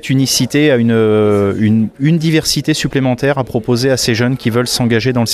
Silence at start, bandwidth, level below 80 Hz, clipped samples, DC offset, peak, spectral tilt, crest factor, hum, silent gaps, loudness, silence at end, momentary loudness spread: 0.05 s; 15.5 kHz; -42 dBFS; under 0.1%; under 0.1%; 0 dBFS; -5 dB/octave; 12 dB; none; none; -13 LUFS; 0 s; 4 LU